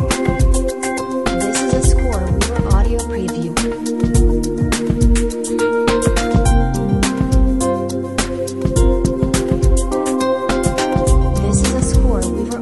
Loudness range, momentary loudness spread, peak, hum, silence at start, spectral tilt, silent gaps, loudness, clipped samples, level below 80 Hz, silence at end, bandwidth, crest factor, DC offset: 1 LU; 5 LU; -2 dBFS; none; 0 s; -5.5 dB/octave; none; -17 LUFS; under 0.1%; -18 dBFS; 0 s; 12 kHz; 14 dB; 0.5%